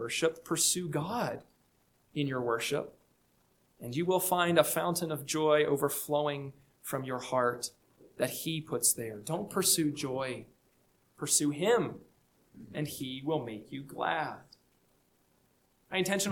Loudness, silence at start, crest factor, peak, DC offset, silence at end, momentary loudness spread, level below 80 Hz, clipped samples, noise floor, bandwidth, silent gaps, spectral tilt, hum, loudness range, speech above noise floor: -31 LUFS; 0 s; 22 dB; -10 dBFS; under 0.1%; 0 s; 14 LU; -72 dBFS; under 0.1%; -70 dBFS; 19 kHz; none; -3.5 dB/octave; none; 7 LU; 39 dB